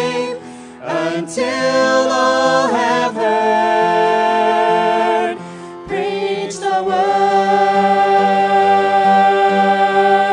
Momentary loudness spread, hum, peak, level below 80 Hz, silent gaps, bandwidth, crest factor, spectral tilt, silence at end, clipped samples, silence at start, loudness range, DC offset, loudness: 10 LU; none; 0 dBFS; -60 dBFS; none; 10.5 kHz; 14 dB; -4.5 dB/octave; 0 s; under 0.1%; 0 s; 4 LU; under 0.1%; -14 LUFS